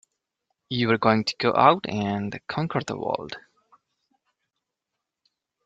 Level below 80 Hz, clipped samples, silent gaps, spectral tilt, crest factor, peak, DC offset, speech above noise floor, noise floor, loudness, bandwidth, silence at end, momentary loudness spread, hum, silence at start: -64 dBFS; under 0.1%; none; -6 dB/octave; 24 dB; -2 dBFS; under 0.1%; 61 dB; -84 dBFS; -24 LUFS; 9 kHz; 2.25 s; 13 LU; none; 0.7 s